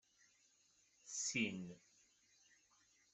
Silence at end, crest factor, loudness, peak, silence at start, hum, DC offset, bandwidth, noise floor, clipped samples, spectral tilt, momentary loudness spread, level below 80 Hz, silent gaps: 1.35 s; 24 dB; -43 LUFS; -26 dBFS; 1.05 s; none; under 0.1%; 8.2 kHz; -76 dBFS; under 0.1%; -2.5 dB/octave; 24 LU; -86 dBFS; none